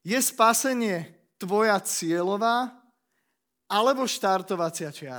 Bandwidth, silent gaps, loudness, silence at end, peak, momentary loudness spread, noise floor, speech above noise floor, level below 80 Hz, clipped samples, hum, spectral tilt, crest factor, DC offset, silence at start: over 20 kHz; none; -25 LUFS; 0 s; -6 dBFS; 13 LU; -78 dBFS; 54 dB; -84 dBFS; under 0.1%; none; -3 dB/octave; 20 dB; under 0.1%; 0.05 s